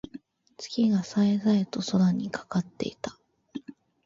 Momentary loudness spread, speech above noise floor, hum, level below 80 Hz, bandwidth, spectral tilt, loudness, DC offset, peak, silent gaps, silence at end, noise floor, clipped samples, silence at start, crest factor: 18 LU; 22 dB; none; -64 dBFS; 7.6 kHz; -6.5 dB/octave; -27 LUFS; under 0.1%; -12 dBFS; none; 0.35 s; -48 dBFS; under 0.1%; 0.15 s; 16 dB